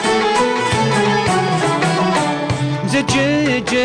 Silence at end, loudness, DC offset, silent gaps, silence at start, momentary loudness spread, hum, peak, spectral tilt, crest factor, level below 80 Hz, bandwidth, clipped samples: 0 s; -16 LUFS; under 0.1%; none; 0 s; 3 LU; none; -6 dBFS; -4.5 dB/octave; 10 dB; -44 dBFS; 10 kHz; under 0.1%